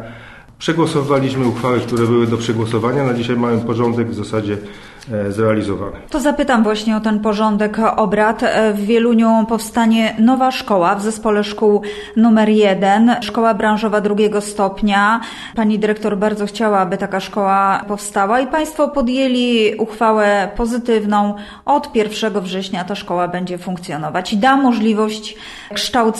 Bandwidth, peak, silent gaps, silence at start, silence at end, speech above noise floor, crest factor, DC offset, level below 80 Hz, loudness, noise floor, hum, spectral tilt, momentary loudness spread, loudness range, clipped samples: 12.5 kHz; -2 dBFS; none; 0 s; 0 s; 22 dB; 14 dB; under 0.1%; -44 dBFS; -16 LUFS; -37 dBFS; none; -5.5 dB/octave; 9 LU; 4 LU; under 0.1%